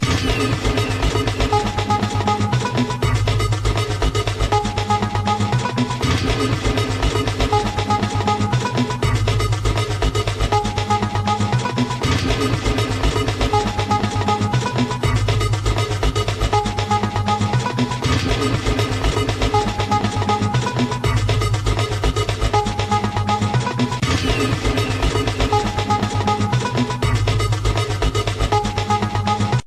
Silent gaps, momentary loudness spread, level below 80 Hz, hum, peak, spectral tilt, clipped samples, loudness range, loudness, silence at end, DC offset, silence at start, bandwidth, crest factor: none; 2 LU; -28 dBFS; none; -4 dBFS; -5.5 dB/octave; under 0.1%; 0 LU; -19 LUFS; 0 s; under 0.1%; 0 s; 13.5 kHz; 14 dB